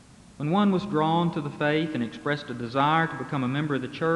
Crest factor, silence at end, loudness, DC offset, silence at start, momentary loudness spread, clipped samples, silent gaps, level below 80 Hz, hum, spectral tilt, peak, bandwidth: 18 dB; 0 s; -26 LUFS; under 0.1%; 0.4 s; 7 LU; under 0.1%; none; -62 dBFS; none; -7 dB/octave; -8 dBFS; 11 kHz